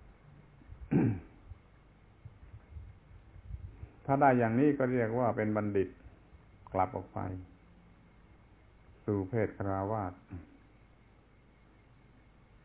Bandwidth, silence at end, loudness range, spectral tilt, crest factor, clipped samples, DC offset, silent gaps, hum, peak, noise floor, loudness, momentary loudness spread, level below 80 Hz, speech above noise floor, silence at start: 4 kHz; 2.25 s; 9 LU; -9 dB/octave; 22 dB; under 0.1%; under 0.1%; none; none; -12 dBFS; -62 dBFS; -32 LUFS; 25 LU; -56 dBFS; 31 dB; 0.7 s